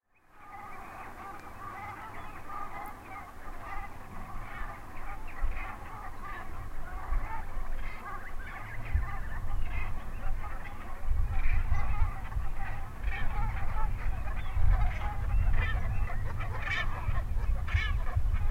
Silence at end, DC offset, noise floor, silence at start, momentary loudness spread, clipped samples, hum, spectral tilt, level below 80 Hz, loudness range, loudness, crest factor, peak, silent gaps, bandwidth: 0 s; under 0.1%; -54 dBFS; 0.35 s; 13 LU; under 0.1%; none; -6 dB/octave; -32 dBFS; 10 LU; -37 LUFS; 16 dB; -14 dBFS; none; 5.8 kHz